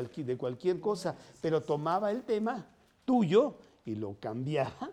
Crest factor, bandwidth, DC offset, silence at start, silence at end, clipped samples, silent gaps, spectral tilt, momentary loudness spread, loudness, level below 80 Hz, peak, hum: 18 dB; 12 kHz; under 0.1%; 0 s; 0 s; under 0.1%; none; -7 dB/octave; 12 LU; -32 LUFS; -70 dBFS; -14 dBFS; none